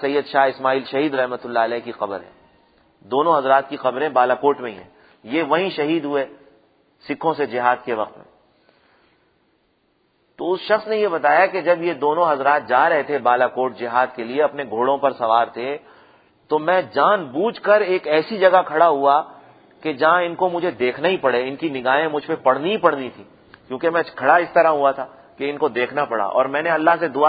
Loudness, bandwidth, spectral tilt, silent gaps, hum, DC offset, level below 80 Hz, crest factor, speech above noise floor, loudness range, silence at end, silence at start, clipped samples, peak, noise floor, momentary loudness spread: -19 LUFS; 5 kHz; -8.5 dB/octave; none; none; under 0.1%; -68 dBFS; 20 dB; 45 dB; 7 LU; 0 s; 0 s; under 0.1%; 0 dBFS; -64 dBFS; 11 LU